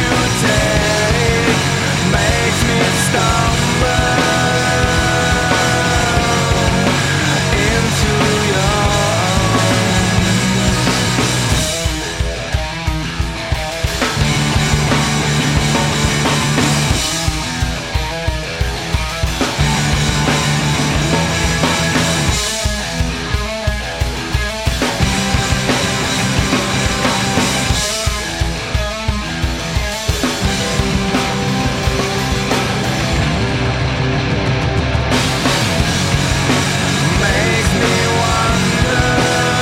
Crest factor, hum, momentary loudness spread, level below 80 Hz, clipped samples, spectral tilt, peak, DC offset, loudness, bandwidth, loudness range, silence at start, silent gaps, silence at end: 14 dB; none; 6 LU; -24 dBFS; under 0.1%; -4 dB/octave; 0 dBFS; under 0.1%; -15 LUFS; 16.5 kHz; 4 LU; 0 s; none; 0 s